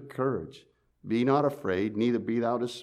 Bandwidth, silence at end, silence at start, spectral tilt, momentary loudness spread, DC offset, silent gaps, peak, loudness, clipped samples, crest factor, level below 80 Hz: 13.5 kHz; 0 s; 0 s; -7 dB/octave; 10 LU; under 0.1%; none; -12 dBFS; -28 LUFS; under 0.1%; 16 dB; -68 dBFS